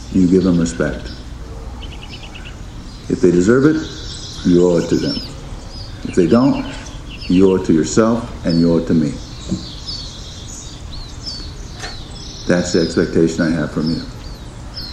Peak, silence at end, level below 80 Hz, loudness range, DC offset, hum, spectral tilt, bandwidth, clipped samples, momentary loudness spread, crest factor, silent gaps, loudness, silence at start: 0 dBFS; 0 s; -34 dBFS; 7 LU; under 0.1%; none; -6 dB/octave; 11 kHz; under 0.1%; 19 LU; 18 dB; none; -16 LUFS; 0 s